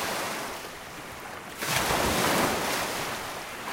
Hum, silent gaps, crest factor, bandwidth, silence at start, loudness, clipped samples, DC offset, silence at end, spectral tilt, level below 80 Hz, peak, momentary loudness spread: none; none; 18 dB; 16.5 kHz; 0 s; -28 LUFS; under 0.1%; under 0.1%; 0 s; -2.5 dB/octave; -50 dBFS; -12 dBFS; 15 LU